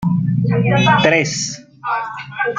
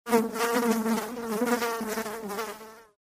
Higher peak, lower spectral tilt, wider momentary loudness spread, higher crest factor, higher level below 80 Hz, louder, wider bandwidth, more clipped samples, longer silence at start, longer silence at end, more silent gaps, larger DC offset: first, -2 dBFS vs -8 dBFS; about the same, -5 dB/octave vs -4 dB/octave; about the same, 12 LU vs 11 LU; about the same, 16 dB vs 20 dB; first, -48 dBFS vs -66 dBFS; first, -16 LUFS vs -29 LUFS; second, 9.4 kHz vs 16 kHz; neither; about the same, 0 s vs 0.05 s; second, 0 s vs 0.25 s; neither; neither